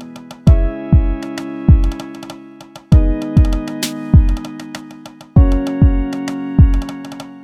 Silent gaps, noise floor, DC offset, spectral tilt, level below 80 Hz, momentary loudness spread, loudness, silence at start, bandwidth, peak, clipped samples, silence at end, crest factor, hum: none; -37 dBFS; under 0.1%; -7.5 dB/octave; -16 dBFS; 18 LU; -15 LUFS; 0 s; 14.5 kHz; 0 dBFS; under 0.1%; 0 s; 14 dB; none